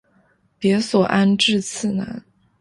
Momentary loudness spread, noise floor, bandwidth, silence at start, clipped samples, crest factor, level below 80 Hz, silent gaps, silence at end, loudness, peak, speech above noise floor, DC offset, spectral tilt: 12 LU; -60 dBFS; 11.5 kHz; 0.6 s; under 0.1%; 16 dB; -58 dBFS; none; 0.4 s; -19 LUFS; -4 dBFS; 42 dB; under 0.1%; -4.5 dB/octave